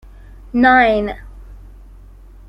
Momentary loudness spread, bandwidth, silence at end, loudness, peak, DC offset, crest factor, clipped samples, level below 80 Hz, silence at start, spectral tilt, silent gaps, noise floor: 16 LU; 5.8 kHz; 0.9 s; -14 LUFS; -2 dBFS; under 0.1%; 16 dB; under 0.1%; -36 dBFS; 0.55 s; -7 dB/octave; none; -40 dBFS